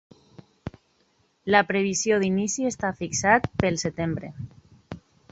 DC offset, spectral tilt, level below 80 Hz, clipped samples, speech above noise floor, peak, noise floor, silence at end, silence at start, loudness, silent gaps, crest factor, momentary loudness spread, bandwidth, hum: under 0.1%; -4 dB/octave; -52 dBFS; under 0.1%; 42 dB; -4 dBFS; -66 dBFS; 0.35 s; 0.65 s; -24 LUFS; none; 24 dB; 21 LU; 8.2 kHz; none